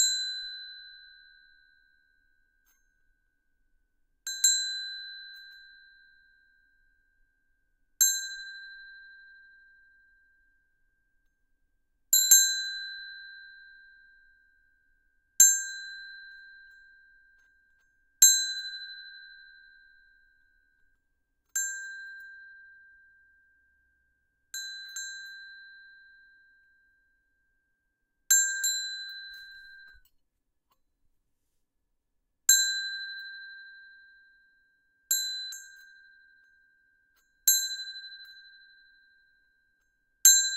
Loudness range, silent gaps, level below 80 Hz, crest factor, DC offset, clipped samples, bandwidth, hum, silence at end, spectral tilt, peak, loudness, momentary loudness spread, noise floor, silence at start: 17 LU; none; -74 dBFS; 30 dB; under 0.1%; under 0.1%; 16 kHz; none; 0 s; 6.5 dB/octave; -4 dBFS; -24 LUFS; 29 LU; -78 dBFS; 0 s